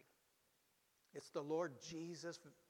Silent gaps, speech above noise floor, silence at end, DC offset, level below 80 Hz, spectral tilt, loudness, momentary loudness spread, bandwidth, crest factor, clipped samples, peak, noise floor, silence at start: none; 33 dB; 0.15 s; under 0.1%; -88 dBFS; -5 dB/octave; -47 LUFS; 12 LU; 18 kHz; 20 dB; under 0.1%; -30 dBFS; -80 dBFS; 1.15 s